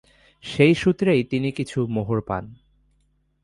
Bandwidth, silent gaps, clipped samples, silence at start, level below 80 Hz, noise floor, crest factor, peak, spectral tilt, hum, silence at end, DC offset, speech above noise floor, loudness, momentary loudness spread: 11.5 kHz; none; under 0.1%; 0.45 s; -50 dBFS; -65 dBFS; 20 dB; -4 dBFS; -7 dB/octave; none; 0.9 s; under 0.1%; 44 dB; -22 LUFS; 13 LU